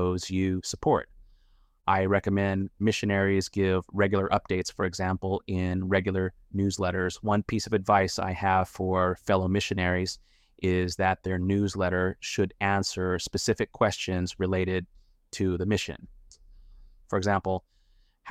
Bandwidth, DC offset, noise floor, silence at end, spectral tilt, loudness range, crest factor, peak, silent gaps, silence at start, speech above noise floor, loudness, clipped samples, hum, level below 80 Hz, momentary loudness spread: 14 kHz; under 0.1%; -63 dBFS; 0 s; -5.5 dB/octave; 4 LU; 18 dB; -8 dBFS; none; 0 s; 36 dB; -28 LUFS; under 0.1%; none; -52 dBFS; 6 LU